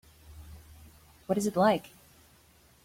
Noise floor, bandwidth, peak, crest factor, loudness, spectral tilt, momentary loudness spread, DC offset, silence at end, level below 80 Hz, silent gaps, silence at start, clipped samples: -61 dBFS; 16.5 kHz; -12 dBFS; 20 dB; -28 LUFS; -5.5 dB/octave; 26 LU; under 0.1%; 1 s; -58 dBFS; none; 0.3 s; under 0.1%